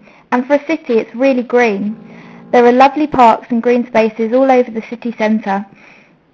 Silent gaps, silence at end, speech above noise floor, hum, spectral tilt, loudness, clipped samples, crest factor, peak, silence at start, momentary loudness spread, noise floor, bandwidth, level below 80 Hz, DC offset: none; 0.7 s; 32 dB; none; -6.5 dB/octave; -13 LUFS; under 0.1%; 14 dB; 0 dBFS; 0.3 s; 11 LU; -45 dBFS; 7.8 kHz; -54 dBFS; under 0.1%